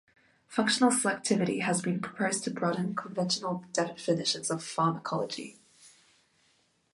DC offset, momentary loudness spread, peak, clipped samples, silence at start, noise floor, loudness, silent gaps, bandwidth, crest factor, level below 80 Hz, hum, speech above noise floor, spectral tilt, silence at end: under 0.1%; 8 LU; -12 dBFS; under 0.1%; 0.5 s; -70 dBFS; -30 LUFS; none; 11.5 kHz; 20 dB; -74 dBFS; none; 40 dB; -4 dB/octave; 1.05 s